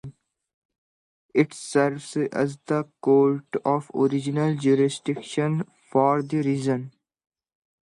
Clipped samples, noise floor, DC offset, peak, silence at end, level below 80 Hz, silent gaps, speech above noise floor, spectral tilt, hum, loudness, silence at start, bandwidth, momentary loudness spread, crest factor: under 0.1%; -44 dBFS; under 0.1%; -6 dBFS; 0.95 s; -70 dBFS; 0.54-0.69 s, 0.78-1.29 s; 21 dB; -6.5 dB/octave; none; -24 LUFS; 0.05 s; 11.5 kHz; 7 LU; 18 dB